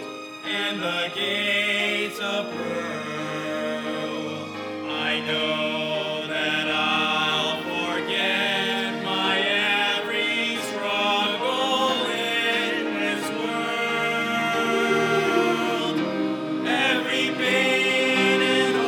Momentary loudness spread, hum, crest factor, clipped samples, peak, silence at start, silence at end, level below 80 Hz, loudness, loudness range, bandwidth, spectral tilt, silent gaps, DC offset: 9 LU; none; 16 dB; under 0.1%; -8 dBFS; 0 s; 0 s; -78 dBFS; -23 LUFS; 5 LU; 19 kHz; -3.5 dB/octave; none; under 0.1%